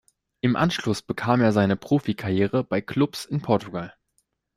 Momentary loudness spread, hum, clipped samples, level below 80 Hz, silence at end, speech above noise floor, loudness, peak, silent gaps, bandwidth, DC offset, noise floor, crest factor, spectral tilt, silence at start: 8 LU; none; under 0.1%; -56 dBFS; 0.65 s; 49 dB; -24 LUFS; -6 dBFS; none; 15.5 kHz; under 0.1%; -72 dBFS; 18 dB; -6.5 dB/octave; 0.45 s